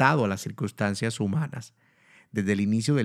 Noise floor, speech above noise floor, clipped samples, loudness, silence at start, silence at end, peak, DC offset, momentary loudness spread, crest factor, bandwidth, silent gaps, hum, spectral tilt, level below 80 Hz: -59 dBFS; 33 dB; under 0.1%; -27 LUFS; 0 s; 0 s; -4 dBFS; under 0.1%; 10 LU; 22 dB; 14 kHz; none; none; -6 dB/octave; -70 dBFS